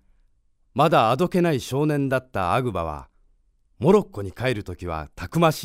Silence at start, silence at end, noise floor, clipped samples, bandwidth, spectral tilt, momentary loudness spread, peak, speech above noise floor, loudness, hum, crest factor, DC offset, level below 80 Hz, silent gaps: 0.75 s; 0 s; -62 dBFS; under 0.1%; 16 kHz; -6.5 dB/octave; 13 LU; -4 dBFS; 41 dB; -23 LUFS; none; 20 dB; under 0.1%; -48 dBFS; none